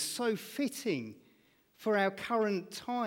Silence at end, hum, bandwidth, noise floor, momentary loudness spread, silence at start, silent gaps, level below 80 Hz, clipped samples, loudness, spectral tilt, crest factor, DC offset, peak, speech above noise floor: 0 s; none; 17.5 kHz; -68 dBFS; 8 LU; 0 s; none; -78 dBFS; under 0.1%; -34 LUFS; -4 dB/octave; 18 dB; under 0.1%; -18 dBFS; 34 dB